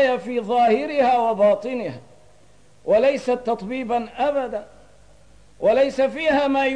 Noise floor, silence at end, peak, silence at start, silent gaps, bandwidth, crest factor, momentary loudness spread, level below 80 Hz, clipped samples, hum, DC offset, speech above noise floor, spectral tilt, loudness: -55 dBFS; 0 s; -8 dBFS; 0 s; none; 10 kHz; 14 dB; 11 LU; -56 dBFS; under 0.1%; 50 Hz at -60 dBFS; 0.3%; 35 dB; -5.5 dB/octave; -20 LUFS